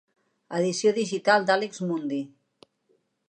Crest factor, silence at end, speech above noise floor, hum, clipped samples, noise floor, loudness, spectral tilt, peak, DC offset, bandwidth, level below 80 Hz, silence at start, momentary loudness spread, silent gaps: 22 dB; 1.05 s; 45 dB; none; under 0.1%; -70 dBFS; -25 LUFS; -4.5 dB/octave; -6 dBFS; under 0.1%; 9.8 kHz; -82 dBFS; 0.5 s; 12 LU; none